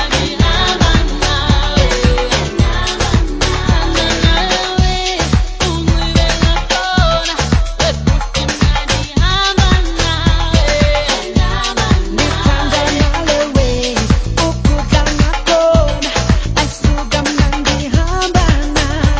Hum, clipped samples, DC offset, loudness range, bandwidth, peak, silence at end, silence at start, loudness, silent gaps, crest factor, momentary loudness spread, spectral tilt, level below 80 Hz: none; under 0.1%; under 0.1%; 1 LU; 8 kHz; 0 dBFS; 0 s; 0 s; -14 LUFS; none; 12 dB; 3 LU; -4.5 dB/octave; -16 dBFS